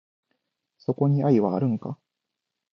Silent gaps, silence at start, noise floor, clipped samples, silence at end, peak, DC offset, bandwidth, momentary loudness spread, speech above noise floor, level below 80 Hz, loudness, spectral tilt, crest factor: none; 0.9 s; -84 dBFS; under 0.1%; 0.8 s; -8 dBFS; under 0.1%; 6 kHz; 16 LU; 62 dB; -70 dBFS; -24 LUFS; -11 dB/octave; 18 dB